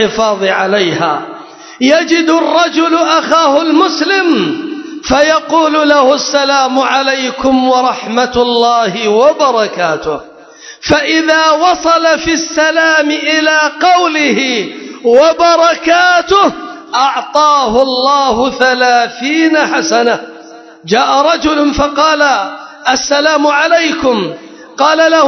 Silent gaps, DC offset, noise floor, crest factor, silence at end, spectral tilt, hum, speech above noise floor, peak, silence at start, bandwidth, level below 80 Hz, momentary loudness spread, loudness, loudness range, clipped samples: none; under 0.1%; -34 dBFS; 10 dB; 0 s; -3 dB/octave; none; 24 dB; 0 dBFS; 0 s; 8 kHz; -42 dBFS; 8 LU; -10 LUFS; 2 LU; 0.2%